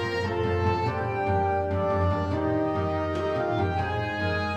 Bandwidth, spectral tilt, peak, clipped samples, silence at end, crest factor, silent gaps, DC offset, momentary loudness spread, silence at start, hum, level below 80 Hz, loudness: 8.4 kHz; -7.5 dB/octave; -14 dBFS; under 0.1%; 0 s; 12 dB; none; under 0.1%; 3 LU; 0 s; none; -46 dBFS; -27 LUFS